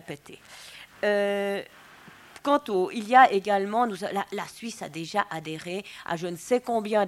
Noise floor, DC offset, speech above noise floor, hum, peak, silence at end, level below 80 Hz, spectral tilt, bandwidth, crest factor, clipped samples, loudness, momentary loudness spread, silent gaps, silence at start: -50 dBFS; under 0.1%; 24 dB; none; -4 dBFS; 0 s; -70 dBFS; -4.5 dB/octave; 15.5 kHz; 22 dB; under 0.1%; -26 LUFS; 22 LU; none; 0.1 s